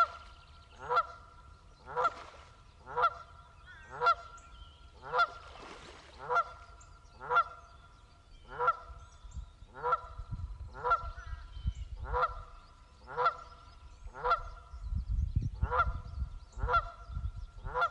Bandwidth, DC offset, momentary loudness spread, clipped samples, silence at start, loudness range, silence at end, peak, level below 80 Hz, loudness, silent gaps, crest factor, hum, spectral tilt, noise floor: 10.5 kHz; under 0.1%; 22 LU; under 0.1%; 0 s; 3 LU; 0 s; -16 dBFS; -44 dBFS; -34 LUFS; none; 20 dB; none; -5.5 dB/octave; -58 dBFS